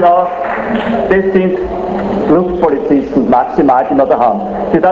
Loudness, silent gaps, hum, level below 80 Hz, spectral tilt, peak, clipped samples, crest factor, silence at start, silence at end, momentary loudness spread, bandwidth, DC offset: -12 LUFS; none; none; -36 dBFS; -9 dB/octave; 0 dBFS; under 0.1%; 12 dB; 0 s; 0 s; 6 LU; 7.4 kHz; under 0.1%